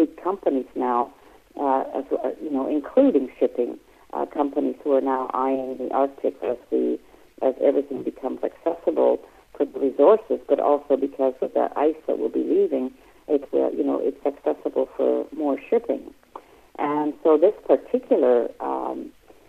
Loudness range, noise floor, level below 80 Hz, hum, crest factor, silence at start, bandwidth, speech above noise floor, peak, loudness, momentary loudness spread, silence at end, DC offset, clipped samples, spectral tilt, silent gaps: 3 LU; -45 dBFS; -62 dBFS; none; 18 dB; 0 s; 6.4 kHz; 23 dB; -4 dBFS; -23 LUFS; 10 LU; 0.4 s; under 0.1%; under 0.1%; -7.5 dB/octave; none